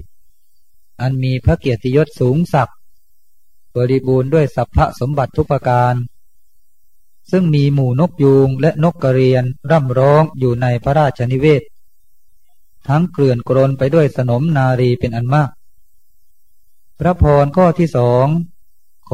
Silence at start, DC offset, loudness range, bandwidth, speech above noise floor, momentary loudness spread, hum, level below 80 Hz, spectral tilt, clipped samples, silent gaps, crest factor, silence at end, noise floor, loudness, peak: 1 s; 1%; 4 LU; 10 kHz; 47 dB; 7 LU; none; -34 dBFS; -9 dB/octave; under 0.1%; none; 16 dB; 0.7 s; -60 dBFS; -15 LUFS; 0 dBFS